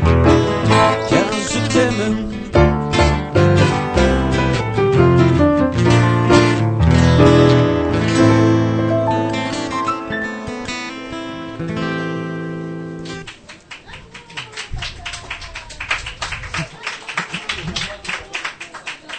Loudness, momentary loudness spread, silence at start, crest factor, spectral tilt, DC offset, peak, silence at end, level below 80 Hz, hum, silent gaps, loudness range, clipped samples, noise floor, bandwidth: -16 LUFS; 16 LU; 0 s; 16 dB; -6 dB/octave; under 0.1%; 0 dBFS; 0 s; -30 dBFS; none; none; 14 LU; under 0.1%; -38 dBFS; 9.2 kHz